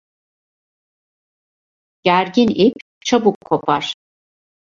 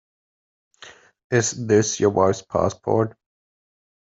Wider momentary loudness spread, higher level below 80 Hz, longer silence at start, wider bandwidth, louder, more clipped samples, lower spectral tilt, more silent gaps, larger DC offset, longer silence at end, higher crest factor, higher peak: first, 11 LU vs 5 LU; about the same, -58 dBFS vs -60 dBFS; first, 2.05 s vs 0.8 s; about the same, 7.6 kHz vs 8 kHz; first, -17 LUFS vs -21 LUFS; neither; about the same, -5 dB/octave vs -5 dB/octave; first, 2.82-3.01 s, 3.35-3.41 s vs 1.24-1.30 s; neither; second, 0.75 s vs 1 s; about the same, 18 dB vs 20 dB; about the same, -2 dBFS vs -4 dBFS